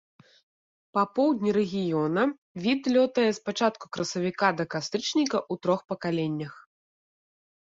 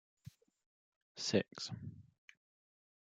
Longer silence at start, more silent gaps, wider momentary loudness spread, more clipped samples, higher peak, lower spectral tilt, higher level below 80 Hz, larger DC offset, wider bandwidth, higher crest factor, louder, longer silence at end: first, 0.95 s vs 0.25 s; second, 2.38-2.55 s vs 0.66-1.15 s; second, 7 LU vs 24 LU; neither; first, -8 dBFS vs -18 dBFS; about the same, -5 dB/octave vs -4.5 dB/octave; first, -70 dBFS vs -80 dBFS; neither; second, 8 kHz vs 9.6 kHz; second, 18 dB vs 28 dB; first, -27 LUFS vs -39 LUFS; about the same, 1.05 s vs 1.15 s